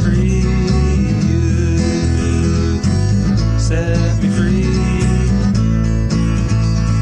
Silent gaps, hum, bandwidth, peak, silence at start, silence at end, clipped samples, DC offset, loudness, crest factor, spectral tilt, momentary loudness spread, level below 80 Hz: none; none; 9.8 kHz; -2 dBFS; 0 s; 0 s; under 0.1%; 0.1%; -15 LUFS; 10 dB; -7 dB/octave; 1 LU; -20 dBFS